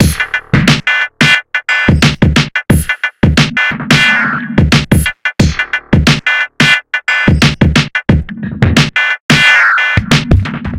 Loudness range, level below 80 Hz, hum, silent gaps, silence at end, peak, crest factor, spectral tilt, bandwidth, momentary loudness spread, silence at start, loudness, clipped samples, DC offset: 1 LU; -22 dBFS; none; 9.20-9.29 s; 0 s; 0 dBFS; 10 dB; -4.5 dB/octave; 16 kHz; 6 LU; 0 s; -10 LUFS; 0.1%; under 0.1%